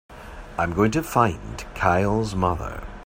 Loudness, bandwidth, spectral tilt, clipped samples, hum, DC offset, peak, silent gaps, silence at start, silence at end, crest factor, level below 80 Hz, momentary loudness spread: -23 LUFS; 16 kHz; -6.5 dB/octave; under 0.1%; none; under 0.1%; -2 dBFS; none; 0.1 s; 0 s; 20 dB; -38 dBFS; 14 LU